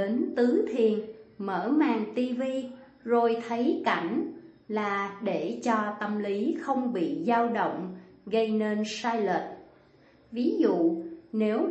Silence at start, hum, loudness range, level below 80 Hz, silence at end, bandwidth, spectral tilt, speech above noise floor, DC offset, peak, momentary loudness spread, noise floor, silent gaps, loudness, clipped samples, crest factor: 0 s; none; 2 LU; -74 dBFS; 0 s; 8.4 kHz; -6 dB/octave; 31 dB; under 0.1%; -10 dBFS; 12 LU; -59 dBFS; none; -28 LUFS; under 0.1%; 18 dB